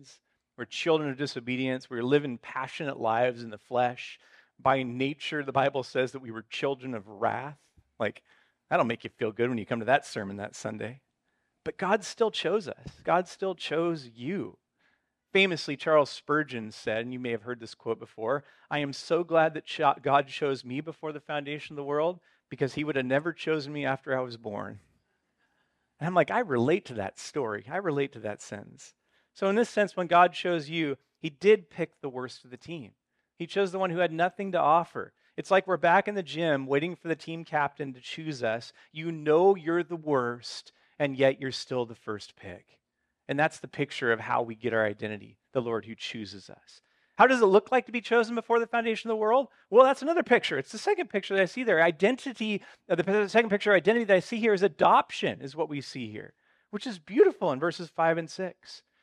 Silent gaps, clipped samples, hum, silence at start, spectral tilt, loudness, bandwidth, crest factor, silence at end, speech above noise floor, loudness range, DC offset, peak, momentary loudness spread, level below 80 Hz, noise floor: none; under 0.1%; none; 0.6 s; -5.5 dB/octave; -28 LUFS; 11 kHz; 24 dB; 0.25 s; 50 dB; 7 LU; under 0.1%; -4 dBFS; 15 LU; -74 dBFS; -78 dBFS